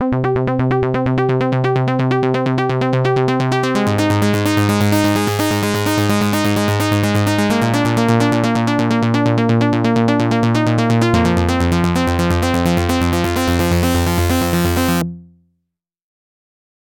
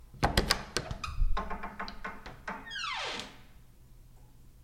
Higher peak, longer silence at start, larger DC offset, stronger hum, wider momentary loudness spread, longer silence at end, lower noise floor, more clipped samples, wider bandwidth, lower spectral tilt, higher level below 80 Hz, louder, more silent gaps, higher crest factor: first, -2 dBFS vs -6 dBFS; about the same, 0 s vs 0 s; neither; neither; second, 2 LU vs 14 LU; first, 1.65 s vs 0 s; first, -74 dBFS vs -54 dBFS; neither; about the same, 18 kHz vs 16.5 kHz; first, -6 dB/octave vs -3.5 dB/octave; about the same, -34 dBFS vs -38 dBFS; first, -16 LUFS vs -35 LUFS; neither; second, 14 dB vs 28 dB